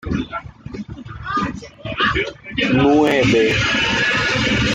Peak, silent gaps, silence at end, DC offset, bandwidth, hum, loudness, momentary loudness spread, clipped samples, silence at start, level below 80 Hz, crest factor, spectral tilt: -4 dBFS; none; 0 s; under 0.1%; 12.5 kHz; none; -17 LUFS; 18 LU; under 0.1%; 0.05 s; -38 dBFS; 14 dB; -5 dB/octave